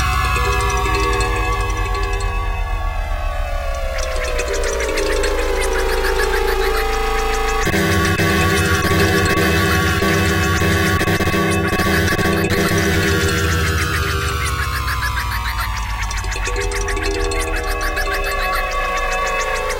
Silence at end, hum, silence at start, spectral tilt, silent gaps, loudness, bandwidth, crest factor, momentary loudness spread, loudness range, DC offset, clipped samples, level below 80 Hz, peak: 0 s; none; 0 s; -4.5 dB/octave; none; -18 LUFS; 17 kHz; 14 dB; 7 LU; 6 LU; under 0.1%; under 0.1%; -24 dBFS; -4 dBFS